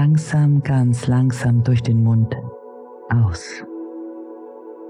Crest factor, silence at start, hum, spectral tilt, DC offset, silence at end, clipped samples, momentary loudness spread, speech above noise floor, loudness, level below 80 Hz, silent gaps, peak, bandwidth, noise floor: 10 dB; 0 s; none; -7.5 dB/octave; under 0.1%; 0 s; under 0.1%; 20 LU; 22 dB; -18 LUFS; -46 dBFS; none; -8 dBFS; 11 kHz; -38 dBFS